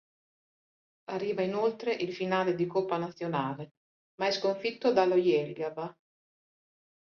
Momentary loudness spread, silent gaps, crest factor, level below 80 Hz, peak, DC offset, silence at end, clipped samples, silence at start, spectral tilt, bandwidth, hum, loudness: 14 LU; 3.71-4.18 s; 20 dB; -76 dBFS; -12 dBFS; under 0.1%; 1.15 s; under 0.1%; 1.1 s; -6 dB/octave; 7 kHz; none; -30 LUFS